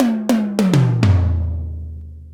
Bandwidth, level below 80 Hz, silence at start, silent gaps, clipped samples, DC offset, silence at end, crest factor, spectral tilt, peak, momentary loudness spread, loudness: 15 kHz; -30 dBFS; 0 s; none; under 0.1%; under 0.1%; 0 s; 16 dB; -7.5 dB/octave; 0 dBFS; 16 LU; -17 LUFS